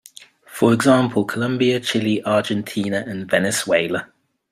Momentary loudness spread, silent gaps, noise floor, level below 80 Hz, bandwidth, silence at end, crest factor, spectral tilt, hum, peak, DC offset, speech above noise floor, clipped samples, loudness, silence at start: 8 LU; none; -45 dBFS; -60 dBFS; 15.5 kHz; 0.45 s; 18 dB; -5 dB/octave; none; -2 dBFS; under 0.1%; 27 dB; under 0.1%; -19 LUFS; 0.5 s